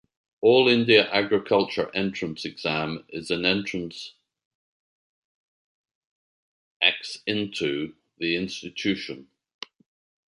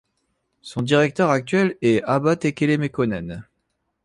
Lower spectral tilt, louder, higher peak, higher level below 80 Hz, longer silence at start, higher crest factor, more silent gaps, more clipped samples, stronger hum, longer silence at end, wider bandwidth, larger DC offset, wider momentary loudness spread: second, -5 dB/octave vs -6.5 dB/octave; second, -24 LUFS vs -20 LUFS; about the same, -2 dBFS vs -4 dBFS; second, -62 dBFS vs -54 dBFS; second, 0.4 s vs 0.65 s; first, 24 dB vs 18 dB; first, 4.45-5.84 s, 5.95-6.80 s vs none; neither; neither; first, 1.05 s vs 0.6 s; about the same, 11 kHz vs 11.5 kHz; neither; first, 19 LU vs 12 LU